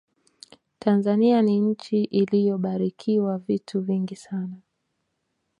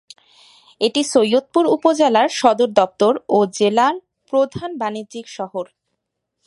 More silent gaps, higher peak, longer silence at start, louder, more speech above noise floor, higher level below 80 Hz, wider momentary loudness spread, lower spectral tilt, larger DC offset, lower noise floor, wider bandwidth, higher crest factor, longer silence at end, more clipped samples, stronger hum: neither; second, -8 dBFS vs 0 dBFS; about the same, 0.85 s vs 0.8 s; second, -23 LUFS vs -17 LUFS; second, 53 dB vs 59 dB; second, -72 dBFS vs -62 dBFS; about the same, 12 LU vs 14 LU; first, -8.5 dB/octave vs -4 dB/octave; neither; about the same, -76 dBFS vs -76 dBFS; second, 9.8 kHz vs 11.5 kHz; about the same, 16 dB vs 18 dB; first, 1.05 s vs 0.8 s; neither; neither